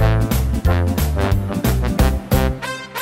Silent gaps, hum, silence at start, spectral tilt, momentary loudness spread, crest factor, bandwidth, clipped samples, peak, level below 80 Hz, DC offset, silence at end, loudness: none; none; 0 s; -6 dB/octave; 3 LU; 16 dB; 16.5 kHz; under 0.1%; -2 dBFS; -22 dBFS; under 0.1%; 0 s; -19 LUFS